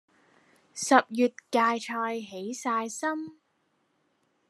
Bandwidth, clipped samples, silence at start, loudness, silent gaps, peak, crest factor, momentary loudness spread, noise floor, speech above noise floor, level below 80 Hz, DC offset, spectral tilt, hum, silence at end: 13 kHz; under 0.1%; 0.75 s; -28 LUFS; none; -6 dBFS; 24 dB; 14 LU; -73 dBFS; 46 dB; under -90 dBFS; under 0.1%; -3 dB/octave; none; 1.2 s